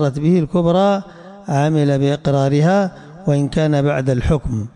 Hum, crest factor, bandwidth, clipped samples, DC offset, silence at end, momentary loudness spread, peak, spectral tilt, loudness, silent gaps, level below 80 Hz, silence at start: none; 12 dB; 10 kHz; under 0.1%; under 0.1%; 0.05 s; 8 LU; -4 dBFS; -7.5 dB/octave; -17 LUFS; none; -36 dBFS; 0 s